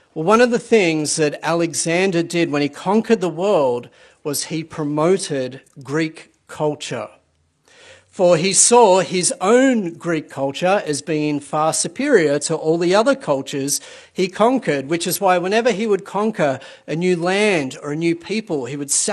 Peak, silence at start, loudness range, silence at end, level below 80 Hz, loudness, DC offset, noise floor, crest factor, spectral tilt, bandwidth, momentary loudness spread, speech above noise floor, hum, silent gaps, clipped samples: 0 dBFS; 0.15 s; 7 LU; 0 s; -64 dBFS; -18 LUFS; under 0.1%; -62 dBFS; 18 dB; -4 dB/octave; 13 kHz; 10 LU; 44 dB; none; none; under 0.1%